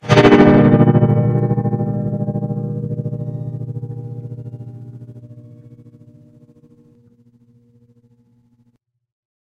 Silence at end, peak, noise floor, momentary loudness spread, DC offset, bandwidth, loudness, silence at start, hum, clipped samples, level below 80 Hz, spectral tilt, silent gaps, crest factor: 3.95 s; 0 dBFS; -62 dBFS; 24 LU; under 0.1%; 7.8 kHz; -15 LUFS; 0.05 s; none; under 0.1%; -44 dBFS; -8 dB/octave; none; 18 dB